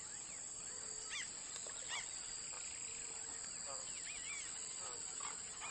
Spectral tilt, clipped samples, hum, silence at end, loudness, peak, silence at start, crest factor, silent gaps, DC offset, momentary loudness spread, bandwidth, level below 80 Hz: 1 dB/octave; under 0.1%; none; 0 s; -44 LUFS; -30 dBFS; 0 s; 18 dB; none; under 0.1%; 2 LU; 11.5 kHz; -74 dBFS